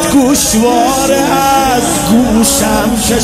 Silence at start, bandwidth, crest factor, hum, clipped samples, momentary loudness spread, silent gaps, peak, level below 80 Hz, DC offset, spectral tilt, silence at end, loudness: 0 s; 16.5 kHz; 10 dB; none; under 0.1%; 3 LU; none; 0 dBFS; -28 dBFS; under 0.1%; -3.5 dB/octave; 0 s; -9 LUFS